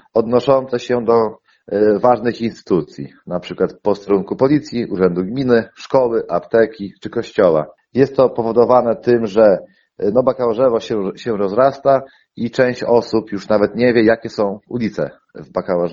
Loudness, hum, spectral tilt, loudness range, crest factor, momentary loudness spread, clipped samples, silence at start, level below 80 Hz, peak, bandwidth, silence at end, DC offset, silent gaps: -17 LUFS; none; -7.5 dB/octave; 3 LU; 16 dB; 10 LU; under 0.1%; 0.15 s; -52 dBFS; 0 dBFS; 7.4 kHz; 0 s; under 0.1%; none